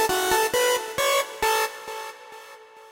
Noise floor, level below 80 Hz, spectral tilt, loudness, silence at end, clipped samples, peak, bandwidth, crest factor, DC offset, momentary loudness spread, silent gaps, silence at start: -46 dBFS; -54 dBFS; -1 dB/octave; -23 LUFS; 0 s; under 0.1%; -8 dBFS; 16.5 kHz; 16 dB; under 0.1%; 20 LU; none; 0 s